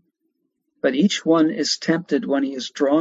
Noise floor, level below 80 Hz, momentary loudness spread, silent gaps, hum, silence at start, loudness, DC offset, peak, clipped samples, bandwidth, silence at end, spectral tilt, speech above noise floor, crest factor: -73 dBFS; -72 dBFS; 5 LU; none; none; 0.85 s; -20 LUFS; under 0.1%; -6 dBFS; under 0.1%; 8 kHz; 0 s; -4.5 dB/octave; 53 dB; 16 dB